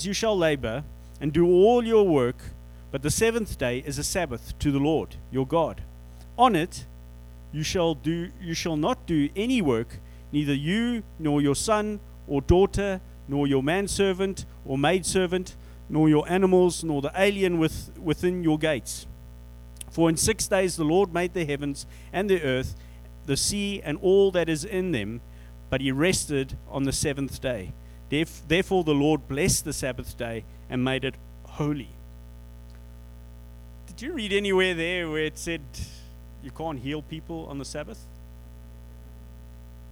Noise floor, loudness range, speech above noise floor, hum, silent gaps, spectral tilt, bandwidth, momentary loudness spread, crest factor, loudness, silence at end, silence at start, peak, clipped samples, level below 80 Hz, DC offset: -44 dBFS; 9 LU; 19 dB; 60 Hz at -45 dBFS; none; -5 dB/octave; over 20 kHz; 17 LU; 20 dB; -25 LUFS; 0 s; 0 s; -6 dBFS; under 0.1%; -42 dBFS; under 0.1%